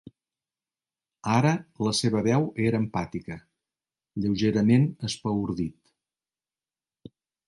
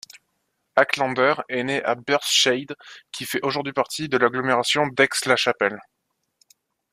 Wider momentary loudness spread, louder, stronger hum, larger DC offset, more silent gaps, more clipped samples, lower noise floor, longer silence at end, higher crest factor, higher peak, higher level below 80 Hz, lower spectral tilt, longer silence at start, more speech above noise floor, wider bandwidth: first, 14 LU vs 10 LU; second, -26 LUFS vs -21 LUFS; neither; neither; neither; neither; first, under -90 dBFS vs -74 dBFS; first, 1.75 s vs 1.1 s; about the same, 18 dB vs 22 dB; second, -10 dBFS vs -2 dBFS; first, -56 dBFS vs -68 dBFS; first, -6 dB/octave vs -2.5 dB/octave; first, 1.25 s vs 0.15 s; first, over 65 dB vs 52 dB; second, 11.5 kHz vs 15.5 kHz